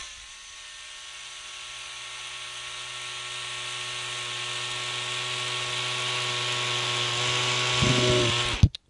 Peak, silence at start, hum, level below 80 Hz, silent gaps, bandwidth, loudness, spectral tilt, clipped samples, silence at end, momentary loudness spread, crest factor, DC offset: -4 dBFS; 0 s; none; -44 dBFS; none; 11.5 kHz; -27 LUFS; -3 dB/octave; under 0.1%; 0.2 s; 17 LU; 24 dB; under 0.1%